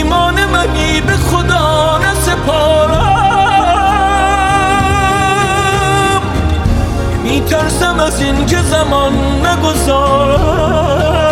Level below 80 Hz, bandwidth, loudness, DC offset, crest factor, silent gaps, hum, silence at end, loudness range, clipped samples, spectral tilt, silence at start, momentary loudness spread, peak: -20 dBFS; 16.5 kHz; -11 LUFS; under 0.1%; 10 dB; none; none; 0 s; 2 LU; under 0.1%; -5 dB/octave; 0 s; 3 LU; 0 dBFS